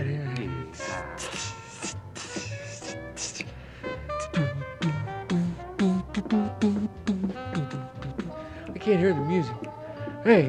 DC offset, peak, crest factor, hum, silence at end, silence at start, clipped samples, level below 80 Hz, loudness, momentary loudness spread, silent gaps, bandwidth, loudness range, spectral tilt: under 0.1%; -6 dBFS; 24 dB; none; 0 s; 0 s; under 0.1%; -52 dBFS; -30 LUFS; 12 LU; none; 11.5 kHz; 7 LU; -6 dB/octave